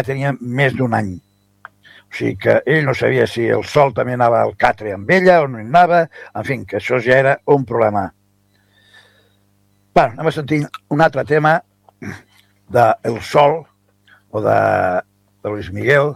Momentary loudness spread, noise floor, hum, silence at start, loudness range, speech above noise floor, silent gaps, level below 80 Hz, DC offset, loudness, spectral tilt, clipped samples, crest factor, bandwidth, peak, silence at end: 12 LU; -58 dBFS; 50 Hz at -50 dBFS; 0 s; 4 LU; 43 dB; none; -48 dBFS; under 0.1%; -16 LUFS; -7 dB/octave; under 0.1%; 16 dB; 14.5 kHz; 0 dBFS; 0 s